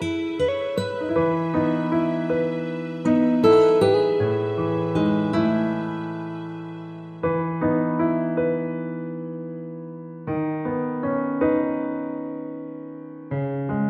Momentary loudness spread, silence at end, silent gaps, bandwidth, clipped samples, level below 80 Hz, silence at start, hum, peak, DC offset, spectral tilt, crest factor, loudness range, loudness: 16 LU; 0 s; none; 9.8 kHz; under 0.1%; -56 dBFS; 0 s; none; -4 dBFS; under 0.1%; -8 dB/octave; 18 dB; 6 LU; -23 LUFS